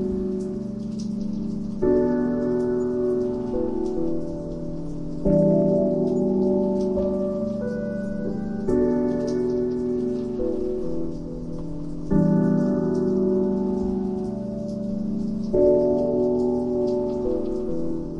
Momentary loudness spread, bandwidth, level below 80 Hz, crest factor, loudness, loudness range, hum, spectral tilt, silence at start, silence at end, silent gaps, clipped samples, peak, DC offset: 10 LU; 7.8 kHz; -42 dBFS; 16 dB; -24 LUFS; 3 LU; none; -9.5 dB/octave; 0 s; 0 s; none; under 0.1%; -6 dBFS; 0.5%